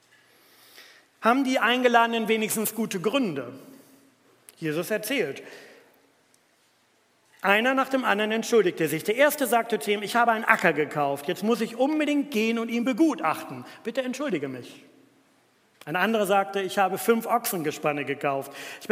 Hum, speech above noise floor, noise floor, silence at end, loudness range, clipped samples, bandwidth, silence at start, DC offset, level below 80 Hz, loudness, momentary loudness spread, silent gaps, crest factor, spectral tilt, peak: none; 40 dB; -65 dBFS; 0.05 s; 8 LU; under 0.1%; 16 kHz; 0.75 s; under 0.1%; -82 dBFS; -25 LUFS; 11 LU; none; 26 dB; -4 dB/octave; 0 dBFS